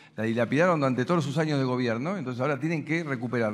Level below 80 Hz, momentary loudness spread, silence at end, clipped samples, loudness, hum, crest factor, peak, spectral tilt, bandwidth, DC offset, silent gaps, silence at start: -74 dBFS; 7 LU; 0 s; under 0.1%; -27 LUFS; none; 16 dB; -10 dBFS; -7 dB/octave; 11.5 kHz; under 0.1%; none; 0.15 s